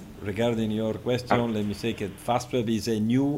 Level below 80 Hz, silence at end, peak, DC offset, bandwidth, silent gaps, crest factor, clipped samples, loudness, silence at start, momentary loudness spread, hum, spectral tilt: -54 dBFS; 0 s; -6 dBFS; under 0.1%; 16 kHz; none; 20 dB; under 0.1%; -27 LUFS; 0 s; 6 LU; none; -6 dB/octave